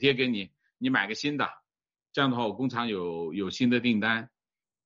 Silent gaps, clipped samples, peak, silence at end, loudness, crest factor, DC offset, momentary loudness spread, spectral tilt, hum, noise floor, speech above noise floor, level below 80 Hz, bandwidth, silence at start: none; under 0.1%; -8 dBFS; 0.6 s; -28 LUFS; 22 dB; under 0.1%; 8 LU; -5.5 dB/octave; none; under -90 dBFS; over 62 dB; -68 dBFS; 7.6 kHz; 0 s